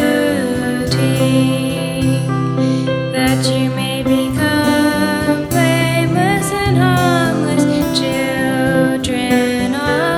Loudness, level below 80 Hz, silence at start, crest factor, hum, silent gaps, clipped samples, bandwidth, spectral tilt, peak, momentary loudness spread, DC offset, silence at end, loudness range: -15 LUFS; -40 dBFS; 0 s; 14 dB; none; none; under 0.1%; 19.5 kHz; -5.5 dB/octave; -2 dBFS; 4 LU; under 0.1%; 0 s; 2 LU